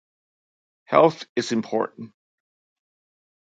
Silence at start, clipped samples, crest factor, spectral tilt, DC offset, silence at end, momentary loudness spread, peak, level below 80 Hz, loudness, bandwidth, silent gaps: 0.9 s; under 0.1%; 26 dB; -5.5 dB/octave; under 0.1%; 1.4 s; 20 LU; 0 dBFS; -72 dBFS; -22 LUFS; 9.2 kHz; 1.29-1.36 s